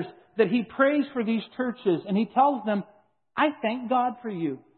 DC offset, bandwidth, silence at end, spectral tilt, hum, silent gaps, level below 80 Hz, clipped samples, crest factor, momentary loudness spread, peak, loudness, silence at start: under 0.1%; 4.4 kHz; 0.2 s; -10.5 dB/octave; none; none; -74 dBFS; under 0.1%; 18 dB; 8 LU; -8 dBFS; -26 LUFS; 0 s